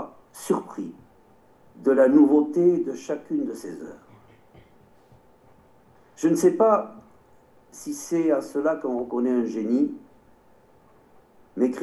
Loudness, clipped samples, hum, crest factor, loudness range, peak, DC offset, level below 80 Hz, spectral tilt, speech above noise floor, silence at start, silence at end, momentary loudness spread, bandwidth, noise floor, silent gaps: -23 LUFS; under 0.1%; none; 20 dB; 6 LU; -6 dBFS; under 0.1%; -68 dBFS; -6.5 dB/octave; 35 dB; 0 s; 0 s; 21 LU; 12.5 kHz; -57 dBFS; none